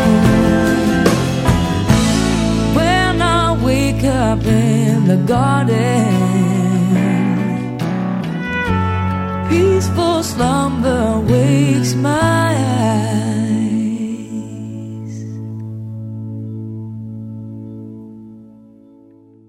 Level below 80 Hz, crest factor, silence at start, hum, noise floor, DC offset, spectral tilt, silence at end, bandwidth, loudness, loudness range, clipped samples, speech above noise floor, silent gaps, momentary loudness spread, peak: -32 dBFS; 16 dB; 0 s; none; -45 dBFS; under 0.1%; -6 dB/octave; 1.05 s; 16 kHz; -15 LUFS; 14 LU; under 0.1%; 31 dB; none; 14 LU; 0 dBFS